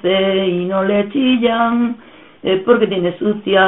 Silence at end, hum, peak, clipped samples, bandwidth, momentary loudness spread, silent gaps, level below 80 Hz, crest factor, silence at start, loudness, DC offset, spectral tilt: 0 s; none; 0 dBFS; under 0.1%; 4 kHz; 6 LU; none; -54 dBFS; 14 dB; 0.05 s; -16 LUFS; 0.2%; -3.5 dB/octave